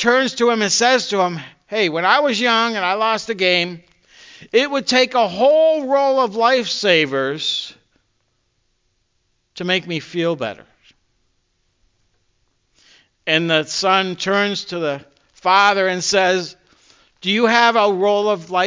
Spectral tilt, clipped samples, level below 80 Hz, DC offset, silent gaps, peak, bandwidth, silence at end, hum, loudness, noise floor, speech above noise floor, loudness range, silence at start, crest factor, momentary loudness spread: -3 dB/octave; under 0.1%; -66 dBFS; under 0.1%; none; 0 dBFS; 7.6 kHz; 0 s; none; -17 LUFS; -67 dBFS; 50 dB; 10 LU; 0 s; 18 dB; 11 LU